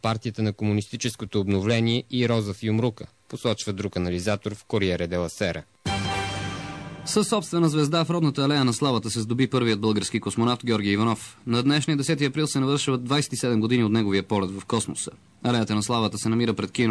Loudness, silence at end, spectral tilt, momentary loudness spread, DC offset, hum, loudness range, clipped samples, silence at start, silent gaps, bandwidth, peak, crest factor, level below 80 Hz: -25 LUFS; 0 s; -5 dB/octave; 8 LU; under 0.1%; none; 4 LU; under 0.1%; 0 s; none; 11 kHz; -10 dBFS; 14 dB; -54 dBFS